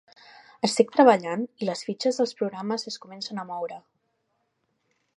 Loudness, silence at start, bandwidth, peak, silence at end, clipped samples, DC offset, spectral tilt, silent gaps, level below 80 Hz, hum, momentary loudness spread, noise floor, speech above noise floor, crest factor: -25 LUFS; 0.65 s; 11.5 kHz; -2 dBFS; 1.4 s; under 0.1%; under 0.1%; -4.5 dB/octave; none; -80 dBFS; none; 16 LU; -75 dBFS; 50 dB; 24 dB